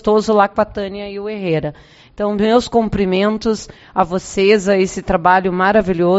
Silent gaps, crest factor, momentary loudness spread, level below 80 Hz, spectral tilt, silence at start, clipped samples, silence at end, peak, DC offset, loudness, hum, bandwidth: none; 16 dB; 10 LU; -40 dBFS; -4.5 dB/octave; 0.05 s; under 0.1%; 0 s; 0 dBFS; under 0.1%; -16 LUFS; none; 8 kHz